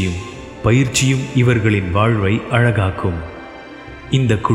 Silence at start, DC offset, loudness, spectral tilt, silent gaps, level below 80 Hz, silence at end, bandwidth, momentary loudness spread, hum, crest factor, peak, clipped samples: 0 s; under 0.1%; -16 LUFS; -5.5 dB/octave; none; -38 dBFS; 0 s; 12.5 kHz; 19 LU; none; 16 dB; 0 dBFS; under 0.1%